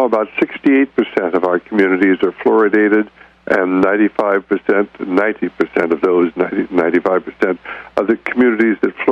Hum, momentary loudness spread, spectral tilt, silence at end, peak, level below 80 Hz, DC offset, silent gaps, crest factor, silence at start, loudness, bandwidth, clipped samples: none; 6 LU; -7.5 dB/octave; 0 s; -2 dBFS; -56 dBFS; under 0.1%; none; 12 dB; 0 s; -15 LUFS; 6.4 kHz; under 0.1%